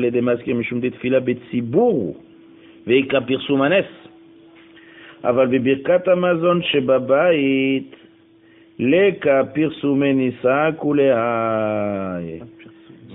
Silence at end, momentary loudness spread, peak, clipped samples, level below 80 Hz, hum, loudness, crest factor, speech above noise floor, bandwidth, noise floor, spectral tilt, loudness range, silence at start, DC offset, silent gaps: 0 s; 9 LU; -4 dBFS; under 0.1%; -58 dBFS; none; -18 LUFS; 14 dB; 33 dB; 4 kHz; -50 dBFS; -11 dB/octave; 3 LU; 0 s; under 0.1%; none